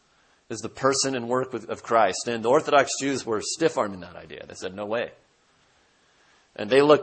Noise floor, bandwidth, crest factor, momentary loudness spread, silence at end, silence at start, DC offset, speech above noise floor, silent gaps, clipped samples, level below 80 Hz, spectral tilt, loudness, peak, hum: -63 dBFS; 8.8 kHz; 22 dB; 17 LU; 0 s; 0.5 s; under 0.1%; 39 dB; none; under 0.1%; -66 dBFS; -3.5 dB/octave; -24 LUFS; -4 dBFS; none